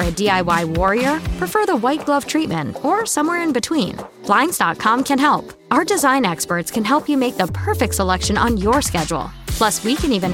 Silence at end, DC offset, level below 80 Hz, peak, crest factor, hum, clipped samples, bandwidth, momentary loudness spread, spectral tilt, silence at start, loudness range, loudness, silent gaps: 0 s; under 0.1%; -34 dBFS; -2 dBFS; 16 dB; none; under 0.1%; 17 kHz; 6 LU; -4 dB/octave; 0 s; 1 LU; -18 LUFS; none